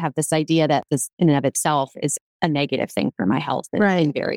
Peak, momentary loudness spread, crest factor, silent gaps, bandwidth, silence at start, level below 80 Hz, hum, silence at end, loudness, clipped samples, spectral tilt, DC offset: -2 dBFS; 6 LU; 18 dB; 1.13-1.17 s, 2.21-2.40 s; 16.5 kHz; 0 s; -64 dBFS; none; 0 s; -21 LUFS; under 0.1%; -5 dB/octave; under 0.1%